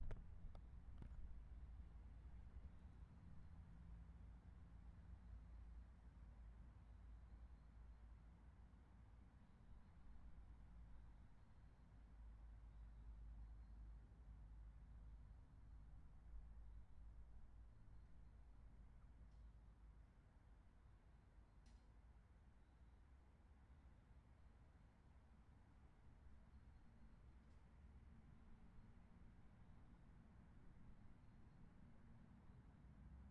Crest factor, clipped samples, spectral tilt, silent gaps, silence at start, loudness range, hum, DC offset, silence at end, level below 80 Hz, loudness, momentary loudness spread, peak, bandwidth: 22 dB; under 0.1%; -8 dB/octave; none; 0 s; 6 LU; none; under 0.1%; 0 s; -64 dBFS; -66 LUFS; 7 LU; -40 dBFS; 4.5 kHz